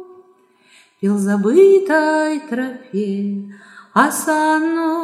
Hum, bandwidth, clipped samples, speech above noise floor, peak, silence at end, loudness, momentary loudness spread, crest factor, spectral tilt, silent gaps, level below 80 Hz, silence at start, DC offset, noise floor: none; 15 kHz; under 0.1%; 37 dB; 0 dBFS; 0 s; -16 LUFS; 13 LU; 16 dB; -5.5 dB/octave; none; -76 dBFS; 0 s; under 0.1%; -53 dBFS